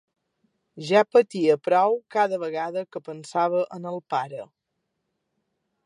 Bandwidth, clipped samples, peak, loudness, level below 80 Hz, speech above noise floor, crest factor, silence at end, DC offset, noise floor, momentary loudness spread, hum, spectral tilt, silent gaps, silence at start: 11 kHz; under 0.1%; -6 dBFS; -23 LUFS; -82 dBFS; 56 dB; 20 dB; 1.4 s; under 0.1%; -79 dBFS; 16 LU; none; -5.5 dB/octave; none; 0.75 s